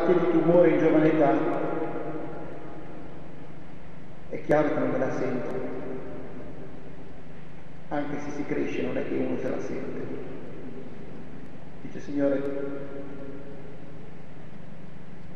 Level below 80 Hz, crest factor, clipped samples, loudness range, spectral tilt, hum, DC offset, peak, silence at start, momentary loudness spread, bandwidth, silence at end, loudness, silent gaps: -56 dBFS; 20 dB; under 0.1%; 9 LU; -8 dB/octave; none; 3%; -8 dBFS; 0 s; 24 LU; 7 kHz; 0 s; -27 LUFS; none